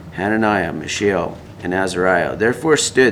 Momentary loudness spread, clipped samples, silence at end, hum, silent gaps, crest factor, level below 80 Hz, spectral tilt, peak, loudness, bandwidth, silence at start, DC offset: 7 LU; under 0.1%; 0 s; none; none; 16 dB; -46 dBFS; -4 dB/octave; -2 dBFS; -18 LUFS; 15.5 kHz; 0 s; under 0.1%